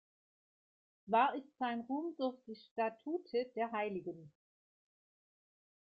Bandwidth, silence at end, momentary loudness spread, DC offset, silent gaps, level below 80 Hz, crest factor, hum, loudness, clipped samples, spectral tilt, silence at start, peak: 5.2 kHz; 1.55 s; 14 LU; under 0.1%; 2.71-2.76 s; -86 dBFS; 22 dB; none; -38 LUFS; under 0.1%; -3.5 dB/octave; 1.05 s; -18 dBFS